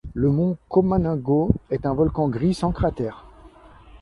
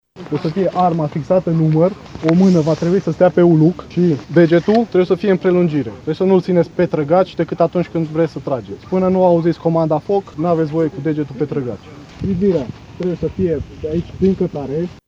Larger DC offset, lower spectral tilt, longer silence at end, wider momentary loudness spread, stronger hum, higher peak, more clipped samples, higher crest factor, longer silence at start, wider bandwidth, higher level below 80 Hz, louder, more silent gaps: neither; about the same, -9 dB/octave vs -9 dB/octave; about the same, 0.05 s vs 0.1 s; second, 4 LU vs 10 LU; neither; about the same, -2 dBFS vs 0 dBFS; neither; first, 22 dB vs 16 dB; about the same, 0.05 s vs 0.15 s; first, 11.5 kHz vs 7.4 kHz; first, -38 dBFS vs -44 dBFS; second, -22 LUFS vs -16 LUFS; neither